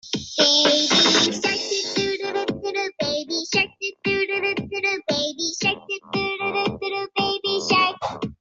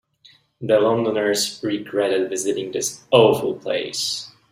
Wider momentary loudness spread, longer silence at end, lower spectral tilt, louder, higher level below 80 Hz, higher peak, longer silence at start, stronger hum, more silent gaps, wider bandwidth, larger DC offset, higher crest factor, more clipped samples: about the same, 11 LU vs 10 LU; second, 0.05 s vs 0.2 s; about the same, -2.5 dB/octave vs -3.5 dB/octave; about the same, -21 LUFS vs -20 LUFS; first, -58 dBFS vs -64 dBFS; about the same, -2 dBFS vs -2 dBFS; second, 0.05 s vs 0.6 s; neither; neither; second, 8 kHz vs 16 kHz; neither; about the same, 20 dB vs 18 dB; neither